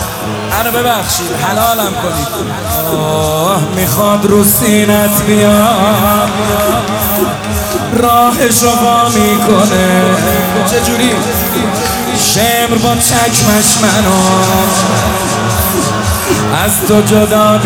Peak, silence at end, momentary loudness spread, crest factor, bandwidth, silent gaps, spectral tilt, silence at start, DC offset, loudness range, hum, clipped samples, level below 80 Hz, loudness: 0 dBFS; 0 s; 6 LU; 10 dB; over 20 kHz; none; -4 dB/octave; 0 s; under 0.1%; 3 LU; none; 0.7%; -32 dBFS; -10 LUFS